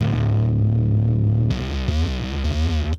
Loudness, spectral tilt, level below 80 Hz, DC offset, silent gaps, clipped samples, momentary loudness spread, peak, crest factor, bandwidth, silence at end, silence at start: -21 LUFS; -7.5 dB/octave; -26 dBFS; under 0.1%; none; under 0.1%; 5 LU; -8 dBFS; 12 dB; 7.2 kHz; 0 s; 0 s